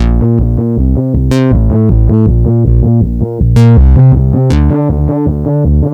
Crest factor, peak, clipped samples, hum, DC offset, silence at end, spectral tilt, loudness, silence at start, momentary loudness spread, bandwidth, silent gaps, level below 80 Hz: 8 dB; 0 dBFS; 3%; none; under 0.1%; 0 s; -9.5 dB/octave; -9 LUFS; 0 s; 6 LU; 7.8 kHz; none; -12 dBFS